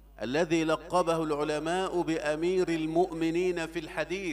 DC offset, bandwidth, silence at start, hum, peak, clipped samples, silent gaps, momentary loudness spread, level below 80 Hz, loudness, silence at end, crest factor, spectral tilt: under 0.1%; 13.5 kHz; 0.05 s; none; -14 dBFS; under 0.1%; none; 5 LU; -54 dBFS; -29 LUFS; 0 s; 16 dB; -5.5 dB/octave